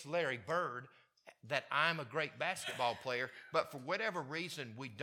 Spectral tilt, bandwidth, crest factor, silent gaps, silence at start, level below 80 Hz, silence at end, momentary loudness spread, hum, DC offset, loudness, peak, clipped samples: -3.5 dB/octave; 17.5 kHz; 22 dB; none; 0 s; -86 dBFS; 0 s; 9 LU; none; under 0.1%; -38 LUFS; -16 dBFS; under 0.1%